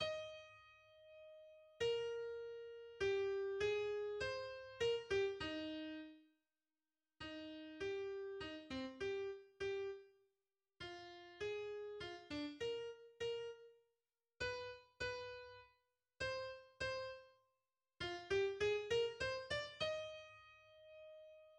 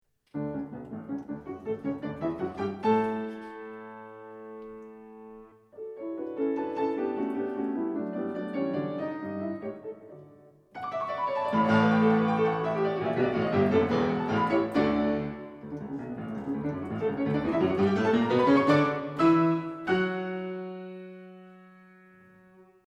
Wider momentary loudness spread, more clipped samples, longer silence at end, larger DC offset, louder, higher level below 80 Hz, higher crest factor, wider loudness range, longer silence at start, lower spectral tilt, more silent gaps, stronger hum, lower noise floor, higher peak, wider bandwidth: about the same, 20 LU vs 20 LU; neither; second, 0 s vs 1.2 s; neither; second, -45 LUFS vs -28 LUFS; second, -70 dBFS vs -60 dBFS; about the same, 18 dB vs 18 dB; about the same, 7 LU vs 9 LU; second, 0 s vs 0.35 s; second, -4 dB/octave vs -8 dB/octave; neither; neither; first, under -90 dBFS vs -57 dBFS; second, -28 dBFS vs -10 dBFS; first, 9.8 kHz vs 8.8 kHz